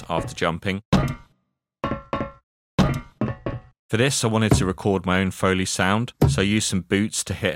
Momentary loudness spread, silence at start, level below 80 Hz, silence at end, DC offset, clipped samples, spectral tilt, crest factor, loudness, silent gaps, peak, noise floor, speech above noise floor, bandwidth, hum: 10 LU; 0 s; -38 dBFS; 0 s; under 0.1%; under 0.1%; -5 dB/octave; 20 dB; -23 LUFS; 0.85-0.92 s, 2.43-2.78 s, 3.79-3.89 s; -4 dBFS; -74 dBFS; 53 dB; 16.5 kHz; none